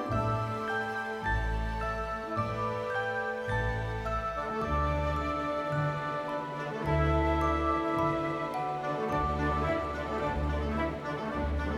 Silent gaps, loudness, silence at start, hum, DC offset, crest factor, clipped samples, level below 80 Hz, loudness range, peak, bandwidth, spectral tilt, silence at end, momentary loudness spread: none; -32 LUFS; 0 s; none; under 0.1%; 16 dB; under 0.1%; -38 dBFS; 3 LU; -16 dBFS; 12.5 kHz; -7 dB/octave; 0 s; 5 LU